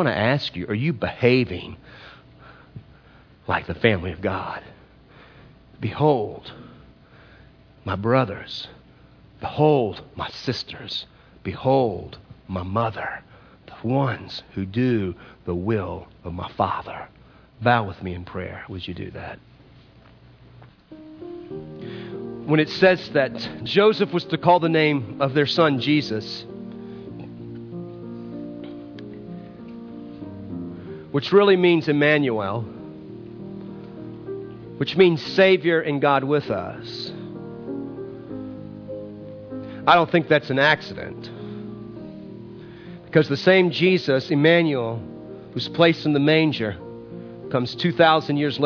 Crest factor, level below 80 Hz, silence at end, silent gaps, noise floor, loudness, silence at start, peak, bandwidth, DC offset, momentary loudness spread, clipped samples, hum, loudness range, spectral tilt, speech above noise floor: 20 dB; -54 dBFS; 0 s; none; -51 dBFS; -21 LUFS; 0 s; -2 dBFS; 5.4 kHz; under 0.1%; 20 LU; under 0.1%; none; 13 LU; -7 dB/octave; 30 dB